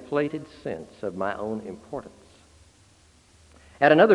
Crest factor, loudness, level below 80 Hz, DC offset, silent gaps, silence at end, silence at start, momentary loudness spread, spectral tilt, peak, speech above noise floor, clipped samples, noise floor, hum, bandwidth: 22 dB; -27 LUFS; -62 dBFS; under 0.1%; none; 0 s; 0 s; 18 LU; -6.5 dB/octave; -4 dBFS; 34 dB; under 0.1%; -57 dBFS; none; 11 kHz